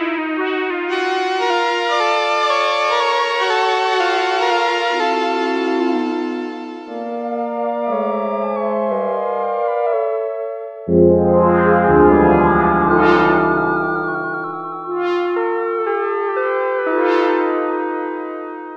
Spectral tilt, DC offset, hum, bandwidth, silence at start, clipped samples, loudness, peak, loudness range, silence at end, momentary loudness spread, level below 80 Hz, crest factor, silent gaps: -6 dB/octave; under 0.1%; none; 9 kHz; 0 s; under 0.1%; -17 LUFS; 0 dBFS; 7 LU; 0 s; 11 LU; -42 dBFS; 16 dB; none